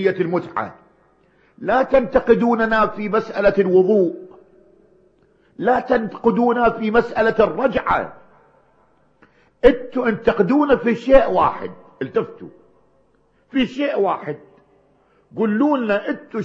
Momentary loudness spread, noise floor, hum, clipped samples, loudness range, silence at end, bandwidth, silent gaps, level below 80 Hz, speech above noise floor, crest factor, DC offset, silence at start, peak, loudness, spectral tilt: 12 LU; -60 dBFS; none; under 0.1%; 6 LU; 0 s; 7.2 kHz; none; -42 dBFS; 42 dB; 20 dB; under 0.1%; 0 s; 0 dBFS; -18 LUFS; -7.5 dB/octave